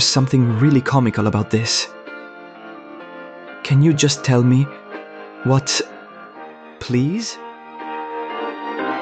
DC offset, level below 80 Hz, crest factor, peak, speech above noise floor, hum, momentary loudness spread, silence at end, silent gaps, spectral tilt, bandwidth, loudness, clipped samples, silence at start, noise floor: under 0.1%; -54 dBFS; 16 dB; -2 dBFS; 22 dB; none; 22 LU; 0 s; none; -5 dB/octave; 9 kHz; -18 LUFS; under 0.1%; 0 s; -38 dBFS